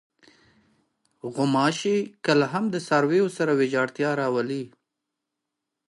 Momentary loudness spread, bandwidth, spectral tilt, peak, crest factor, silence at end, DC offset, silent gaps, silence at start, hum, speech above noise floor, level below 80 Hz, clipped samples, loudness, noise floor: 10 LU; 11.5 kHz; -5.5 dB/octave; -8 dBFS; 18 dB; 1.2 s; under 0.1%; none; 1.25 s; none; 60 dB; -76 dBFS; under 0.1%; -24 LUFS; -84 dBFS